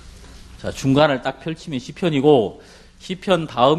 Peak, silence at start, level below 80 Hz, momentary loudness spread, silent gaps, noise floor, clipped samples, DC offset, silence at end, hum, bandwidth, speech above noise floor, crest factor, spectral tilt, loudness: 0 dBFS; 0.05 s; -46 dBFS; 16 LU; none; -41 dBFS; under 0.1%; under 0.1%; 0 s; none; 12.5 kHz; 22 dB; 20 dB; -6 dB/octave; -19 LUFS